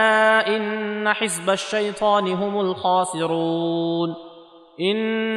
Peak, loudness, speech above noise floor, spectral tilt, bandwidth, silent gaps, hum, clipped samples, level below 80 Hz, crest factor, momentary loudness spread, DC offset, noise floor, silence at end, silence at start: -6 dBFS; -21 LUFS; 24 dB; -4 dB/octave; 13.5 kHz; none; none; under 0.1%; -66 dBFS; 16 dB; 7 LU; under 0.1%; -45 dBFS; 0 s; 0 s